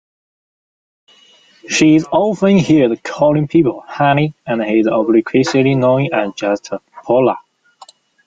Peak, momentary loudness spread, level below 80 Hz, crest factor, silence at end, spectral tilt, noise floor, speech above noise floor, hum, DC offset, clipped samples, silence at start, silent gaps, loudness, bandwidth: -2 dBFS; 8 LU; -54 dBFS; 14 dB; 0.9 s; -6 dB/octave; -49 dBFS; 35 dB; none; under 0.1%; under 0.1%; 1.65 s; none; -14 LUFS; 9.2 kHz